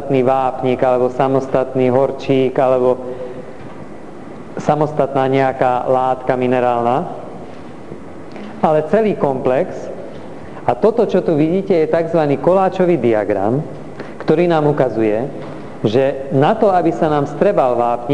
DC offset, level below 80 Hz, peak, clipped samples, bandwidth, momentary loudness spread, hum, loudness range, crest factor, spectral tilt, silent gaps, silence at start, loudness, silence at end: 2%; -52 dBFS; 0 dBFS; under 0.1%; 10.5 kHz; 18 LU; none; 3 LU; 16 dB; -8 dB/octave; none; 0 s; -16 LUFS; 0 s